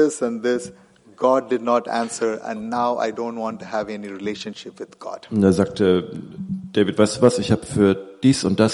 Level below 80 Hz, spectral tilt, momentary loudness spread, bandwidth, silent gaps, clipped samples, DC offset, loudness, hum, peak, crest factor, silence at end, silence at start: -56 dBFS; -6 dB/octave; 15 LU; 11.5 kHz; none; under 0.1%; under 0.1%; -21 LUFS; none; -2 dBFS; 20 dB; 0 s; 0 s